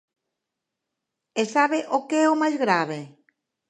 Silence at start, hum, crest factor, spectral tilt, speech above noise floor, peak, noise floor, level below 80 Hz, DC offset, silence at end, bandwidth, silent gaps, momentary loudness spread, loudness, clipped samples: 1.35 s; none; 20 dB; -4.5 dB/octave; 62 dB; -4 dBFS; -84 dBFS; -82 dBFS; under 0.1%; 0.6 s; 10 kHz; none; 10 LU; -23 LUFS; under 0.1%